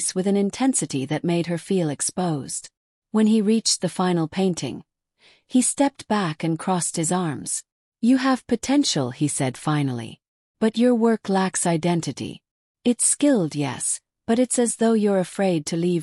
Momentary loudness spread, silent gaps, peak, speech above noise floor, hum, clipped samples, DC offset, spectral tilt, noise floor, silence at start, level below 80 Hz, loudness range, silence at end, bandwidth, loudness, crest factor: 8 LU; 2.77-3.02 s, 7.72-7.92 s, 10.28-10.54 s, 12.51-12.75 s; -8 dBFS; 37 dB; none; under 0.1%; under 0.1%; -4.5 dB/octave; -59 dBFS; 0 s; -62 dBFS; 2 LU; 0 s; 13.5 kHz; -22 LUFS; 14 dB